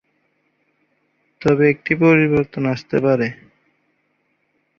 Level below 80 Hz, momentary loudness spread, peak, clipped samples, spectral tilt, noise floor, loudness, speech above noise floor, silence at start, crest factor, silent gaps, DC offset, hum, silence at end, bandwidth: -54 dBFS; 9 LU; -2 dBFS; under 0.1%; -8.5 dB/octave; -67 dBFS; -17 LUFS; 51 dB; 1.4 s; 18 dB; none; under 0.1%; none; 1.45 s; 7.2 kHz